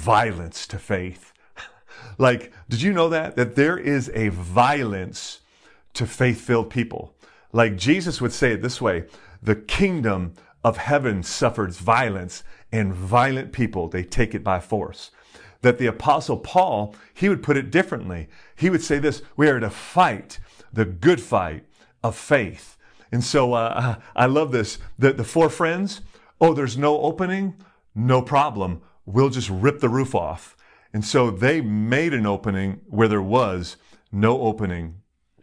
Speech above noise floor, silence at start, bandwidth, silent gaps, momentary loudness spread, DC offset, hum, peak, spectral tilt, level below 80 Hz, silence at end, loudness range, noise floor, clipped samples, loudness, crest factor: 34 dB; 0 s; 10.5 kHz; none; 13 LU; under 0.1%; none; -4 dBFS; -6 dB/octave; -44 dBFS; 0.45 s; 2 LU; -55 dBFS; under 0.1%; -22 LUFS; 18 dB